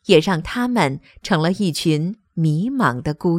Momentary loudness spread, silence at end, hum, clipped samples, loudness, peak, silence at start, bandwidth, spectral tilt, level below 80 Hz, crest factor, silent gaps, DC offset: 6 LU; 0 s; none; under 0.1%; -20 LUFS; 0 dBFS; 0.1 s; 15.5 kHz; -6 dB/octave; -46 dBFS; 18 dB; none; under 0.1%